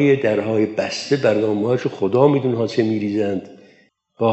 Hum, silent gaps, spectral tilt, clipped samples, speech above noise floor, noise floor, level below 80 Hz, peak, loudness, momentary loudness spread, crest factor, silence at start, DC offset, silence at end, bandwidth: none; none; -6.5 dB/octave; under 0.1%; 37 dB; -55 dBFS; -70 dBFS; -2 dBFS; -19 LUFS; 6 LU; 16 dB; 0 s; under 0.1%; 0 s; 8.2 kHz